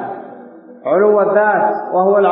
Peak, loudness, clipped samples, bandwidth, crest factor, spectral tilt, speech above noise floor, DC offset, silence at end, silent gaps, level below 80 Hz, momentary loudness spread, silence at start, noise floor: -2 dBFS; -13 LUFS; under 0.1%; 3.9 kHz; 12 dB; -12 dB/octave; 25 dB; under 0.1%; 0 s; none; -76 dBFS; 17 LU; 0 s; -37 dBFS